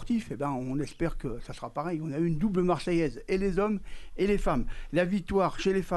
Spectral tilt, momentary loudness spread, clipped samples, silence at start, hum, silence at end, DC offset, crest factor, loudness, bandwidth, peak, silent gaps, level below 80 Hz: -7 dB/octave; 8 LU; under 0.1%; 0 s; none; 0 s; under 0.1%; 14 dB; -30 LUFS; 12 kHz; -14 dBFS; none; -40 dBFS